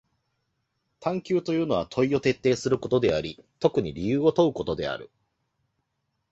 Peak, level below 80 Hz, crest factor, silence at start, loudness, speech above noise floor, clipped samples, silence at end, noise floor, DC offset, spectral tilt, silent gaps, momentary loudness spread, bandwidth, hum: -6 dBFS; -54 dBFS; 22 dB; 1 s; -25 LUFS; 53 dB; under 0.1%; 1.25 s; -78 dBFS; under 0.1%; -6.5 dB/octave; none; 8 LU; 8 kHz; none